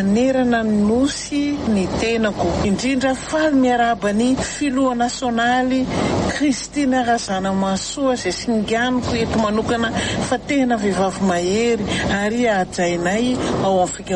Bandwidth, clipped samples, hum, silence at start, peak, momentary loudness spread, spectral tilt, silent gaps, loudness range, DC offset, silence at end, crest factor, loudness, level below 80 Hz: 11 kHz; under 0.1%; none; 0 s; -6 dBFS; 4 LU; -5 dB/octave; none; 1 LU; under 0.1%; 0 s; 12 dB; -19 LUFS; -40 dBFS